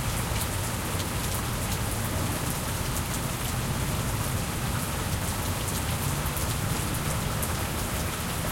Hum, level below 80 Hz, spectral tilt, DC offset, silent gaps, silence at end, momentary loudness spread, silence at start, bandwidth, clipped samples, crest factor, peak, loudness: none; -38 dBFS; -4 dB/octave; under 0.1%; none; 0 s; 1 LU; 0 s; 17 kHz; under 0.1%; 16 dB; -14 dBFS; -29 LUFS